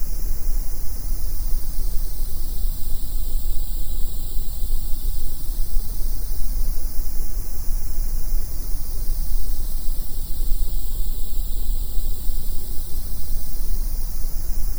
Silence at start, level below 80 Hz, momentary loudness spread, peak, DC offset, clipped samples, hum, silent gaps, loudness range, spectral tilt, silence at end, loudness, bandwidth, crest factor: 0 s; -22 dBFS; 2 LU; -4 dBFS; under 0.1%; under 0.1%; none; none; 0 LU; -4.5 dB/octave; 0 s; -29 LUFS; over 20 kHz; 12 dB